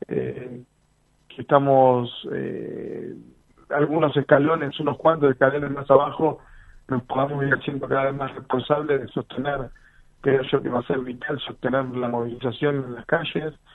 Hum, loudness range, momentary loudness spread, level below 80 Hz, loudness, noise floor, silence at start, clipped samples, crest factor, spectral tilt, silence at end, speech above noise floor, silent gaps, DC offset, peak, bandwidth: none; 5 LU; 14 LU; -54 dBFS; -23 LUFS; -63 dBFS; 0 s; under 0.1%; 22 dB; -9 dB/octave; 0.2 s; 41 dB; none; under 0.1%; 0 dBFS; 4.1 kHz